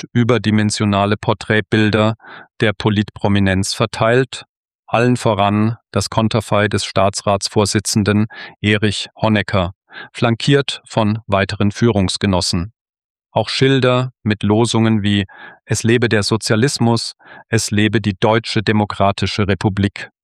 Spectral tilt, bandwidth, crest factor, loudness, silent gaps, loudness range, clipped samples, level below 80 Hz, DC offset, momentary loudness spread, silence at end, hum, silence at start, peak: -5 dB/octave; 13 kHz; 14 dB; -16 LUFS; 4.49-4.65 s, 4.75-4.83 s, 9.75-9.81 s, 12.81-12.93 s, 13.04-13.15 s; 1 LU; under 0.1%; -46 dBFS; under 0.1%; 6 LU; 0.2 s; none; 0.15 s; -2 dBFS